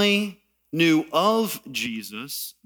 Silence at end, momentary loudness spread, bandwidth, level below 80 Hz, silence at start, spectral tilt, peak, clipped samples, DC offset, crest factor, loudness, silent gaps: 0.15 s; 13 LU; over 20 kHz; -70 dBFS; 0 s; -4 dB/octave; -8 dBFS; under 0.1%; under 0.1%; 16 dB; -24 LUFS; none